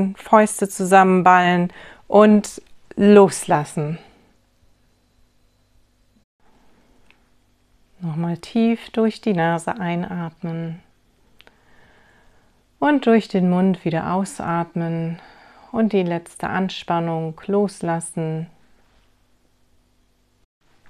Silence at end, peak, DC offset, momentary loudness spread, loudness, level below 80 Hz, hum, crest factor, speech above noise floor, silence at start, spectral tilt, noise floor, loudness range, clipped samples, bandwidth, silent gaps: 2.45 s; 0 dBFS; under 0.1%; 16 LU; -19 LUFS; -60 dBFS; none; 20 dB; 43 dB; 0 s; -6 dB/octave; -61 dBFS; 13 LU; under 0.1%; 14.5 kHz; 6.24-6.39 s